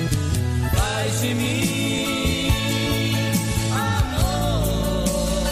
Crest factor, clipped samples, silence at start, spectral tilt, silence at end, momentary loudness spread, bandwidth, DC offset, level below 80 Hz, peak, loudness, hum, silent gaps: 14 dB; under 0.1%; 0 s; -4.5 dB/octave; 0 s; 1 LU; 15.5 kHz; under 0.1%; -30 dBFS; -8 dBFS; -22 LUFS; none; none